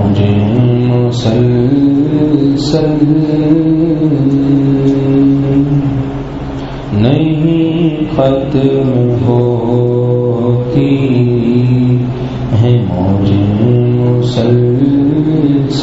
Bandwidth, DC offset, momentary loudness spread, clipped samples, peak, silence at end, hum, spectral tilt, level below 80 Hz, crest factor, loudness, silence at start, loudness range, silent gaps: 7.8 kHz; under 0.1%; 3 LU; under 0.1%; 0 dBFS; 0 s; none; -9 dB/octave; -32 dBFS; 10 dB; -11 LUFS; 0 s; 2 LU; none